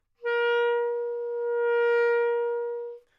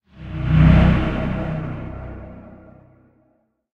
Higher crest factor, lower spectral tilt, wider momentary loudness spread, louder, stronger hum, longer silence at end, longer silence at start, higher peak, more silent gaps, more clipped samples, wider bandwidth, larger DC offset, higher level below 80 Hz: second, 12 dB vs 18 dB; second, -1 dB/octave vs -9.5 dB/octave; second, 8 LU vs 22 LU; second, -26 LUFS vs -18 LUFS; neither; second, 0.2 s vs 1.2 s; about the same, 0.2 s vs 0.2 s; second, -16 dBFS vs -2 dBFS; neither; neither; first, 5.6 kHz vs 5 kHz; neither; second, -80 dBFS vs -26 dBFS